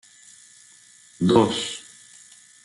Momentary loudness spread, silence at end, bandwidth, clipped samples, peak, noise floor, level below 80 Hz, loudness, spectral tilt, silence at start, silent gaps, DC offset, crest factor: 27 LU; 0.85 s; 12 kHz; under 0.1%; -4 dBFS; -52 dBFS; -60 dBFS; -21 LUFS; -5.5 dB/octave; 1.2 s; none; under 0.1%; 22 dB